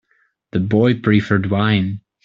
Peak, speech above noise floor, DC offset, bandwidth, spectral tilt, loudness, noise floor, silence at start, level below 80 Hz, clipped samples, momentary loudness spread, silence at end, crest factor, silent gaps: -2 dBFS; 47 dB; under 0.1%; 7 kHz; -8.5 dB/octave; -17 LUFS; -63 dBFS; 0.55 s; -50 dBFS; under 0.1%; 9 LU; 0.25 s; 16 dB; none